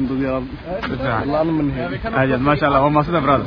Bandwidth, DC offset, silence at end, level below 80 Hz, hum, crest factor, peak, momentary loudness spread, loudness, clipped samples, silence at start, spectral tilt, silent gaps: 5.4 kHz; under 0.1%; 0 s; -36 dBFS; none; 16 dB; -2 dBFS; 10 LU; -19 LUFS; under 0.1%; 0 s; -9.5 dB/octave; none